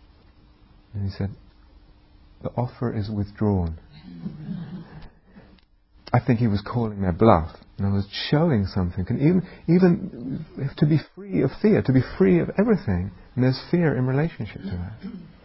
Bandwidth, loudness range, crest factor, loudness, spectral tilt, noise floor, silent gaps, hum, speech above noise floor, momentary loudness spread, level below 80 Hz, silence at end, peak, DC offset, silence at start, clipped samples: 5.8 kHz; 8 LU; 22 dB; -23 LUFS; -12 dB/octave; -56 dBFS; none; none; 33 dB; 17 LU; -42 dBFS; 0.15 s; -2 dBFS; under 0.1%; 0.95 s; under 0.1%